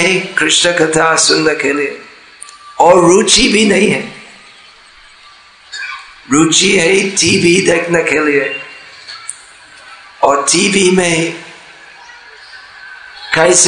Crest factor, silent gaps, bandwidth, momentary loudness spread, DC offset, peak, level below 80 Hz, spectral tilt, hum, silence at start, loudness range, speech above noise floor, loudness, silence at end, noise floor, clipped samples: 14 dB; none; 12 kHz; 22 LU; under 0.1%; 0 dBFS; -44 dBFS; -2.5 dB/octave; none; 0 s; 4 LU; 31 dB; -10 LUFS; 0 s; -41 dBFS; 0.3%